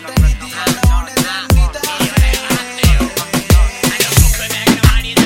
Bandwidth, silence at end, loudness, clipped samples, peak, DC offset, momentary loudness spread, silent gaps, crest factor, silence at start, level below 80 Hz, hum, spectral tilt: 17 kHz; 0 s; -14 LUFS; under 0.1%; 0 dBFS; under 0.1%; 6 LU; none; 12 dB; 0 s; -16 dBFS; none; -4 dB/octave